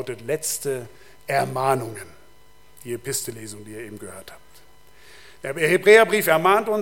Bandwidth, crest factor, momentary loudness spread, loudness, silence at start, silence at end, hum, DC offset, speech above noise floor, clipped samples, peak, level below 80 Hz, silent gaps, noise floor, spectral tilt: 17 kHz; 22 dB; 24 LU; -20 LUFS; 0 s; 0 s; none; 0.5%; 33 dB; under 0.1%; 0 dBFS; -60 dBFS; none; -55 dBFS; -3.5 dB/octave